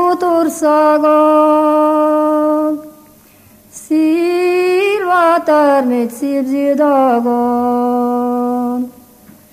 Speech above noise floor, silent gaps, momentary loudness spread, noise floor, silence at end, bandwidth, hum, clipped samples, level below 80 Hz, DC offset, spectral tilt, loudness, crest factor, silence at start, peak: 32 dB; none; 7 LU; -44 dBFS; 0.65 s; 15 kHz; none; under 0.1%; -60 dBFS; under 0.1%; -4.5 dB/octave; -13 LUFS; 12 dB; 0 s; -2 dBFS